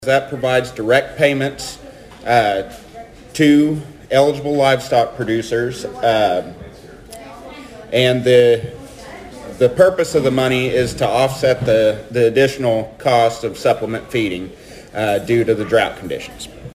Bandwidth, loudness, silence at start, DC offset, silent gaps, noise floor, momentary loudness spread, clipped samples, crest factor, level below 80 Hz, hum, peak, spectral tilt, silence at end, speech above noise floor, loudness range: 15.5 kHz; -16 LUFS; 0 s; under 0.1%; none; -37 dBFS; 21 LU; under 0.1%; 16 dB; -46 dBFS; none; 0 dBFS; -5.5 dB/octave; 0.05 s; 22 dB; 3 LU